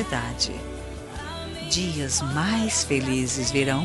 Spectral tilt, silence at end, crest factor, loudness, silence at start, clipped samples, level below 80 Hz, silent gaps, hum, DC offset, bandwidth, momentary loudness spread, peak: -3.5 dB/octave; 0 s; 18 dB; -25 LUFS; 0 s; under 0.1%; -42 dBFS; none; none; under 0.1%; 12 kHz; 13 LU; -8 dBFS